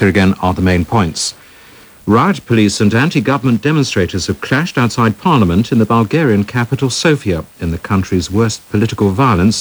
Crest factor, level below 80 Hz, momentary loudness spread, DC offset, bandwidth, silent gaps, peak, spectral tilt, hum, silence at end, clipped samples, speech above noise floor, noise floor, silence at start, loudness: 12 dB; -36 dBFS; 5 LU; under 0.1%; over 20 kHz; none; 0 dBFS; -5.5 dB/octave; none; 0 s; under 0.1%; 27 dB; -40 dBFS; 0 s; -13 LUFS